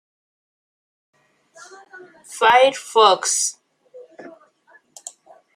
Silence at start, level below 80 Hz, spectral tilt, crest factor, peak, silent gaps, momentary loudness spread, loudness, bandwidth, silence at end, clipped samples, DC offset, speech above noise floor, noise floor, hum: 1.95 s; -74 dBFS; 0.5 dB/octave; 22 dB; 0 dBFS; none; 24 LU; -16 LUFS; 16 kHz; 1.25 s; under 0.1%; under 0.1%; 39 dB; -56 dBFS; none